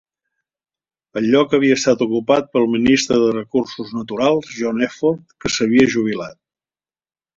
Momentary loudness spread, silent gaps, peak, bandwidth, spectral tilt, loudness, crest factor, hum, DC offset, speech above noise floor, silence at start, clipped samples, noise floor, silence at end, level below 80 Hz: 11 LU; none; -2 dBFS; 7.8 kHz; -4.5 dB/octave; -17 LUFS; 16 dB; none; under 0.1%; over 73 dB; 1.15 s; under 0.1%; under -90 dBFS; 1.05 s; -52 dBFS